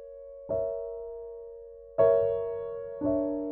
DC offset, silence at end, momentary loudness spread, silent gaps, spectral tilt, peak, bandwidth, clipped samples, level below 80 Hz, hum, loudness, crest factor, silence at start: under 0.1%; 0 s; 21 LU; none; -8.5 dB/octave; -12 dBFS; 3.6 kHz; under 0.1%; -58 dBFS; none; -29 LUFS; 18 dB; 0 s